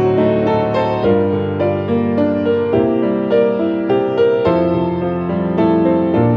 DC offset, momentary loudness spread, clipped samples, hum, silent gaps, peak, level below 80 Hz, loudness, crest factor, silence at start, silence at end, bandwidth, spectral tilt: under 0.1%; 4 LU; under 0.1%; none; none; -2 dBFS; -48 dBFS; -15 LUFS; 12 dB; 0 s; 0 s; 6 kHz; -9.5 dB/octave